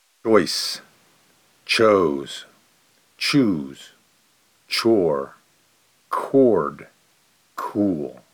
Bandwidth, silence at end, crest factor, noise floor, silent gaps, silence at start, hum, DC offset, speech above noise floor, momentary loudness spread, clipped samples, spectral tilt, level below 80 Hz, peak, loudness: 19.5 kHz; 0.2 s; 22 dB; -61 dBFS; none; 0.25 s; none; under 0.1%; 41 dB; 19 LU; under 0.1%; -4.5 dB/octave; -62 dBFS; -2 dBFS; -21 LUFS